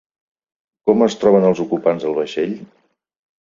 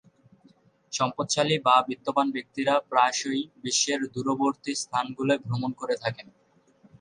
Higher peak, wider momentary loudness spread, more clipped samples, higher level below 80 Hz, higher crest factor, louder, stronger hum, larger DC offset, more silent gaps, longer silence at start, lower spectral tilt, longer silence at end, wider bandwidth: first, -2 dBFS vs -6 dBFS; about the same, 10 LU vs 9 LU; neither; first, -60 dBFS vs -70 dBFS; about the same, 18 dB vs 20 dB; first, -17 LUFS vs -26 LUFS; neither; neither; neither; about the same, 0.85 s vs 0.9 s; first, -7 dB/octave vs -3.5 dB/octave; about the same, 0.75 s vs 0.8 s; second, 7.6 kHz vs 11 kHz